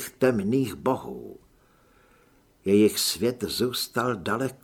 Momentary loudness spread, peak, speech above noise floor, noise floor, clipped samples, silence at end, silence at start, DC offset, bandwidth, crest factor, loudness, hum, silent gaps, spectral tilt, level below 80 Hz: 13 LU; -8 dBFS; 35 dB; -60 dBFS; under 0.1%; 0.1 s; 0 s; under 0.1%; 19 kHz; 18 dB; -25 LUFS; none; none; -4.5 dB/octave; -58 dBFS